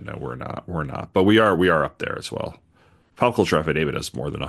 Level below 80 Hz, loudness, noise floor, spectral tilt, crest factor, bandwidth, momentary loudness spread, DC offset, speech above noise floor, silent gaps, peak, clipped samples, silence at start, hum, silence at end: -46 dBFS; -22 LUFS; -57 dBFS; -6 dB/octave; 20 dB; 12.5 kHz; 16 LU; under 0.1%; 36 dB; none; -4 dBFS; under 0.1%; 0 s; none; 0 s